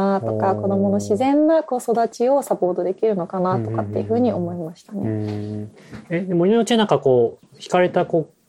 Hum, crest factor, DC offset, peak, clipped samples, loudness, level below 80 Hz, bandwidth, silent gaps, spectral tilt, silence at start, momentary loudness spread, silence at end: none; 16 dB; under 0.1%; -2 dBFS; under 0.1%; -20 LUFS; -62 dBFS; 15 kHz; none; -6.5 dB/octave; 0 s; 11 LU; 0.2 s